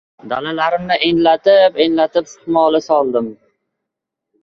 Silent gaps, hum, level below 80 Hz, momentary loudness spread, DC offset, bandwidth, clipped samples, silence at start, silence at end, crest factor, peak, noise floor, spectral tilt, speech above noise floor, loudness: none; none; -56 dBFS; 10 LU; under 0.1%; 7.2 kHz; under 0.1%; 0.25 s; 1.1 s; 14 dB; -2 dBFS; -81 dBFS; -5 dB/octave; 66 dB; -15 LUFS